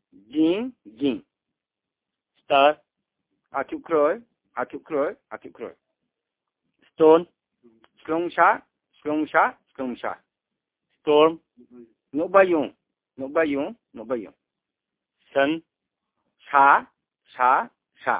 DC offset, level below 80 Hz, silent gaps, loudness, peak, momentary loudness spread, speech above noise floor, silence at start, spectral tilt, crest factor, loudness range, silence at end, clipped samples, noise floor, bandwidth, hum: under 0.1%; -68 dBFS; none; -23 LUFS; -2 dBFS; 19 LU; 66 dB; 0.3 s; -8.5 dB/octave; 22 dB; 5 LU; 0 s; under 0.1%; -87 dBFS; 4 kHz; none